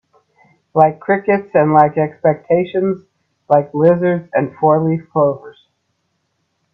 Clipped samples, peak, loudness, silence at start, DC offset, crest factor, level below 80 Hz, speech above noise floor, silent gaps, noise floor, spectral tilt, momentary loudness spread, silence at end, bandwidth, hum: under 0.1%; 0 dBFS; -15 LUFS; 0.75 s; under 0.1%; 16 dB; -60 dBFS; 54 dB; none; -68 dBFS; -10.5 dB/octave; 7 LU; 1.25 s; 4.8 kHz; none